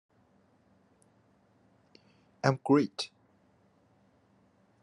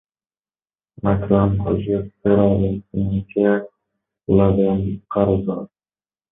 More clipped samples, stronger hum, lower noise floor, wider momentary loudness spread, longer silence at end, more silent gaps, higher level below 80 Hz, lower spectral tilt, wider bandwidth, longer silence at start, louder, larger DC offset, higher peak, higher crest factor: neither; neither; second, -67 dBFS vs under -90 dBFS; first, 13 LU vs 9 LU; first, 1.75 s vs 0.65 s; neither; second, -80 dBFS vs -38 dBFS; second, -6.5 dB/octave vs -13.5 dB/octave; first, 11 kHz vs 3.8 kHz; first, 2.45 s vs 1.05 s; second, -30 LUFS vs -19 LUFS; neither; second, -8 dBFS vs -2 dBFS; first, 28 dB vs 18 dB